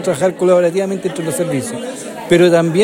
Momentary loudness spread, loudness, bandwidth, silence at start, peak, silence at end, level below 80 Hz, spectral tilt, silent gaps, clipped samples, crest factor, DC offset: 14 LU; -15 LUFS; 16 kHz; 0 s; 0 dBFS; 0 s; -56 dBFS; -5.5 dB/octave; none; under 0.1%; 14 dB; under 0.1%